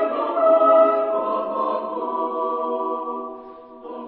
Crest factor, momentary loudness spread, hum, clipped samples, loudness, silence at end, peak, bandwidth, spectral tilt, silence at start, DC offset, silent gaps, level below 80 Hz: 16 dB; 19 LU; none; under 0.1%; -20 LUFS; 0 s; -6 dBFS; 4.3 kHz; -9 dB/octave; 0 s; under 0.1%; none; -68 dBFS